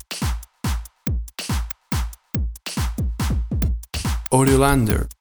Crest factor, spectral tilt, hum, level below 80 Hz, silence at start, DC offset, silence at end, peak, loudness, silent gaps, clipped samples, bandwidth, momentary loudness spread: 20 dB; -5.5 dB/octave; none; -26 dBFS; 0.1 s; under 0.1%; 0.05 s; -2 dBFS; -23 LUFS; none; under 0.1%; over 20 kHz; 11 LU